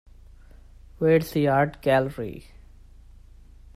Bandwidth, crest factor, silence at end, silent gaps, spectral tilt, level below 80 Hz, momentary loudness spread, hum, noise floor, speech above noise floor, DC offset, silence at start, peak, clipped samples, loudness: 15.5 kHz; 18 dB; 1.35 s; none; -7.5 dB/octave; -48 dBFS; 15 LU; none; -48 dBFS; 26 dB; under 0.1%; 1 s; -8 dBFS; under 0.1%; -23 LUFS